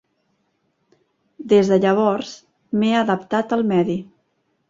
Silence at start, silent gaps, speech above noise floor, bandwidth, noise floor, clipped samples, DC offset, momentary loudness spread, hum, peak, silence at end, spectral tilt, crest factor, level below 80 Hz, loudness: 1.4 s; none; 50 dB; 7.6 kHz; -68 dBFS; under 0.1%; under 0.1%; 12 LU; none; -4 dBFS; 0.65 s; -6.5 dB/octave; 18 dB; -62 dBFS; -19 LUFS